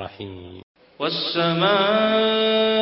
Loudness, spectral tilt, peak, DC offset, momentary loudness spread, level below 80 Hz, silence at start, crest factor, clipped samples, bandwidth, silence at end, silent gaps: -19 LUFS; -9.5 dB/octave; -6 dBFS; under 0.1%; 18 LU; -56 dBFS; 0 s; 16 dB; under 0.1%; 5.8 kHz; 0 s; 0.63-0.75 s